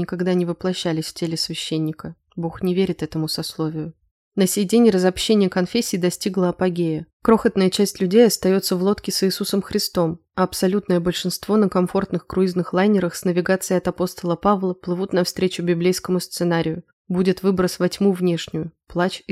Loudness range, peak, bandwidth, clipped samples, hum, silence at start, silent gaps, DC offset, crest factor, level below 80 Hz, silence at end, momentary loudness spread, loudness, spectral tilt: 5 LU; -2 dBFS; 16 kHz; under 0.1%; none; 0 s; 4.11-4.31 s, 7.13-7.20 s, 16.93-17.05 s; under 0.1%; 18 dB; -52 dBFS; 0 s; 8 LU; -21 LUFS; -5.5 dB/octave